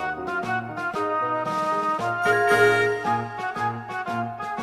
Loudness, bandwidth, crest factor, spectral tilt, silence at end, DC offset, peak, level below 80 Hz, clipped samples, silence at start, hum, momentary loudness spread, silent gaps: -24 LUFS; 15 kHz; 18 dB; -5 dB/octave; 0 s; under 0.1%; -6 dBFS; -62 dBFS; under 0.1%; 0 s; none; 11 LU; none